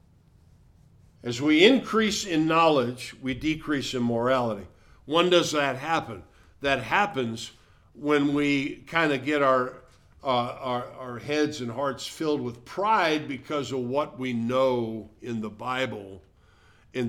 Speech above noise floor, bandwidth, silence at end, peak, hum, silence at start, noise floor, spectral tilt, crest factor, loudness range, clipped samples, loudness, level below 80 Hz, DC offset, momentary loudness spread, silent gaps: 32 dB; 15.5 kHz; 0 s; -4 dBFS; none; 1.25 s; -58 dBFS; -4.5 dB/octave; 22 dB; 5 LU; under 0.1%; -26 LUFS; -56 dBFS; under 0.1%; 14 LU; none